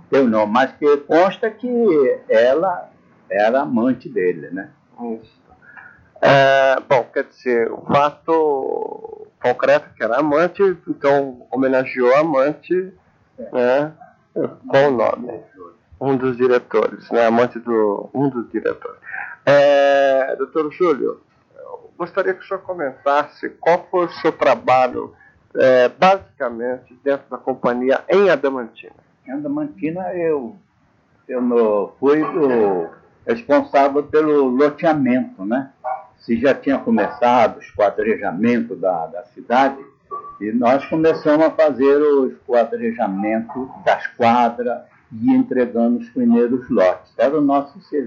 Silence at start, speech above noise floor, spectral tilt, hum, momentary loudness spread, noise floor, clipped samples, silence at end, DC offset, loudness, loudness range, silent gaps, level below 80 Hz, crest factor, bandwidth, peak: 0.1 s; 41 dB; -7 dB/octave; none; 14 LU; -58 dBFS; under 0.1%; 0 s; under 0.1%; -18 LUFS; 4 LU; none; -62 dBFS; 16 dB; 7.2 kHz; -2 dBFS